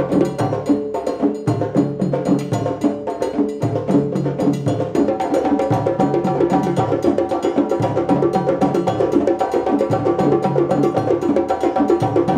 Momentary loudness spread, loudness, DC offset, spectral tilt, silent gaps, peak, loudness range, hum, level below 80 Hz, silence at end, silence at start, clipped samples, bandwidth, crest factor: 4 LU; -18 LUFS; under 0.1%; -8 dB/octave; none; -4 dBFS; 2 LU; none; -50 dBFS; 0 s; 0 s; under 0.1%; 12.5 kHz; 14 dB